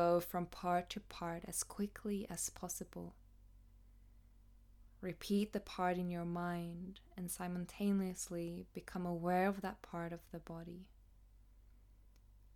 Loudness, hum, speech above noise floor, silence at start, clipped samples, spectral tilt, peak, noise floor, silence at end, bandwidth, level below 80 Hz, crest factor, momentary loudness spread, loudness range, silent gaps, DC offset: -42 LUFS; none; 23 dB; 0 s; under 0.1%; -5 dB/octave; -22 dBFS; -64 dBFS; 0.05 s; 19 kHz; -62 dBFS; 20 dB; 13 LU; 5 LU; none; under 0.1%